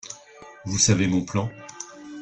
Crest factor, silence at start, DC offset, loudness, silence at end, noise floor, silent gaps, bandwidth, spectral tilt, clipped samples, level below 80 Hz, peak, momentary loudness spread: 20 dB; 0.05 s; under 0.1%; -22 LUFS; 0 s; -46 dBFS; none; 9.6 kHz; -4 dB/octave; under 0.1%; -54 dBFS; -4 dBFS; 20 LU